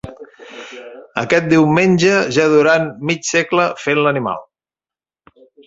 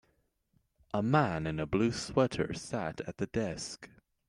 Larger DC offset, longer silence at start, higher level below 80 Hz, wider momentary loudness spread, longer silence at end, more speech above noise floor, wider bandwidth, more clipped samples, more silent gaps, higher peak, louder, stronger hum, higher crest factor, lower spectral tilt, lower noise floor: neither; second, 0.05 s vs 0.95 s; about the same, -54 dBFS vs -58 dBFS; first, 21 LU vs 10 LU; first, 1.25 s vs 0.4 s; first, over 75 dB vs 43 dB; second, 8 kHz vs 11.5 kHz; neither; neither; first, 0 dBFS vs -12 dBFS; first, -15 LUFS vs -33 LUFS; neither; about the same, 16 dB vs 20 dB; about the same, -5 dB/octave vs -6 dB/octave; first, under -90 dBFS vs -75 dBFS